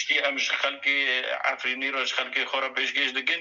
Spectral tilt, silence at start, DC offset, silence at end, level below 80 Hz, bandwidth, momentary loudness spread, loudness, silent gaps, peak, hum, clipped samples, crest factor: 0.5 dB/octave; 0 s; under 0.1%; 0 s; -88 dBFS; 7.8 kHz; 3 LU; -25 LUFS; none; -10 dBFS; none; under 0.1%; 16 dB